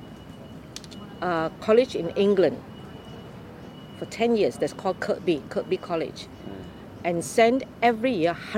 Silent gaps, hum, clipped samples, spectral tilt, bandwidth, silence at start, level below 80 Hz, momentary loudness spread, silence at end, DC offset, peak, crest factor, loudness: none; none; under 0.1%; -5.5 dB/octave; 16 kHz; 0 s; -56 dBFS; 21 LU; 0 s; under 0.1%; -6 dBFS; 20 dB; -25 LUFS